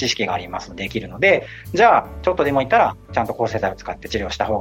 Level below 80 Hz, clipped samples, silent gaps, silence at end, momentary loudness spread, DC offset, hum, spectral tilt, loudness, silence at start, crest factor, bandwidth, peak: -42 dBFS; under 0.1%; none; 0 s; 12 LU; under 0.1%; none; -4.5 dB/octave; -19 LUFS; 0 s; 16 dB; 16.5 kHz; -2 dBFS